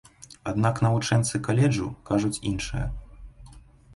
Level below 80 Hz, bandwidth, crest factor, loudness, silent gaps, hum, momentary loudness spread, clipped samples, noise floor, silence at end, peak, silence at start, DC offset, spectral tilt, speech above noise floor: -42 dBFS; 11.5 kHz; 18 dB; -26 LUFS; none; none; 10 LU; under 0.1%; -49 dBFS; 0.35 s; -8 dBFS; 0.2 s; under 0.1%; -6 dB/octave; 25 dB